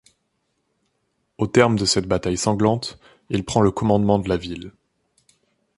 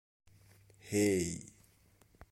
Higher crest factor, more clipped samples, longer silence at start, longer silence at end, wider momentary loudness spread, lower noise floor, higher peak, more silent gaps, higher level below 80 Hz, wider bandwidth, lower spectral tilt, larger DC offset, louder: about the same, 20 dB vs 18 dB; neither; first, 1.4 s vs 0.85 s; first, 1.1 s vs 0.85 s; second, 14 LU vs 25 LU; first, -72 dBFS vs -67 dBFS; first, -2 dBFS vs -20 dBFS; neither; first, -46 dBFS vs -64 dBFS; second, 11.5 kHz vs 16.5 kHz; about the same, -5 dB/octave vs -5 dB/octave; neither; first, -20 LUFS vs -34 LUFS